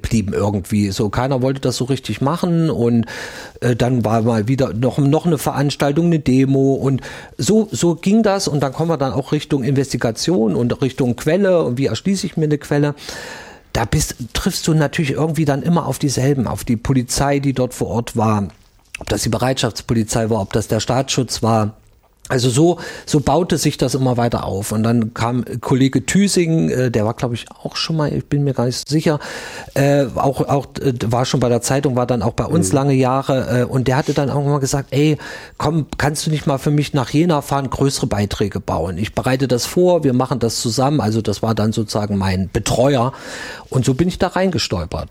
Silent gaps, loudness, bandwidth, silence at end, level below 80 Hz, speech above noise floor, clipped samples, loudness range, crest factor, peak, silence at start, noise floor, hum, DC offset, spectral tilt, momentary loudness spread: none; -18 LUFS; 16.5 kHz; 0 s; -40 dBFS; 27 dB; under 0.1%; 3 LU; 14 dB; -4 dBFS; 0.05 s; -44 dBFS; none; under 0.1%; -5.5 dB/octave; 6 LU